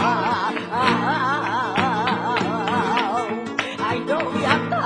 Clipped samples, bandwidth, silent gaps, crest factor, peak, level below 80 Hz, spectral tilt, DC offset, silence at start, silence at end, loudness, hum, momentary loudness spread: under 0.1%; 11 kHz; none; 18 dB; -2 dBFS; -60 dBFS; -5 dB/octave; under 0.1%; 0 s; 0 s; -21 LUFS; none; 4 LU